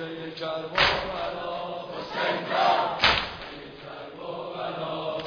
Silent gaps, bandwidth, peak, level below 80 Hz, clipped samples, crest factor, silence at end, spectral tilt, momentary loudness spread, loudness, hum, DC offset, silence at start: none; 5.4 kHz; -4 dBFS; -52 dBFS; under 0.1%; 24 dB; 0 s; -4 dB/octave; 17 LU; -26 LUFS; none; under 0.1%; 0 s